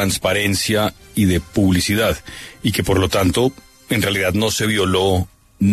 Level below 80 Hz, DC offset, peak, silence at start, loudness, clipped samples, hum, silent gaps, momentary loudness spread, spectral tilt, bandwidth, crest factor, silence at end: -38 dBFS; under 0.1%; -4 dBFS; 0 s; -18 LUFS; under 0.1%; none; none; 6 LU; -4.5 dB/octave; 13.5 kHz; 14 dB; 0 s